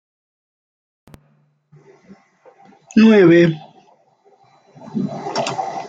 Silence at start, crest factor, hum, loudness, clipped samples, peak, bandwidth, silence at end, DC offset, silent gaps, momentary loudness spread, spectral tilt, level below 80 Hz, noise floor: 2.95 s; 18 dB; none; -15 LUFS; under 0.1%; -2 dBFS; 7.8 kHz; 0 s; under 0.1%; none; 16 LU; -6.5 dB/octave; -62 dBFS; -59 dBFS